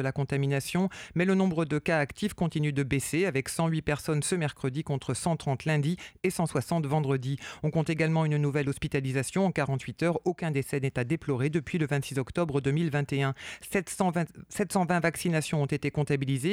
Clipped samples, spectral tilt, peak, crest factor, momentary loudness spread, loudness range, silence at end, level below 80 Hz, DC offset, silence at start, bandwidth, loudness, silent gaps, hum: under 0.1%; -6 dB/octave; -12 dBFS; 18 dB; 5 LU; 2 LU; 0 s; -56 dBFS; under 0.1%; 0 s; 16 kHz; -29 LUFS; none; none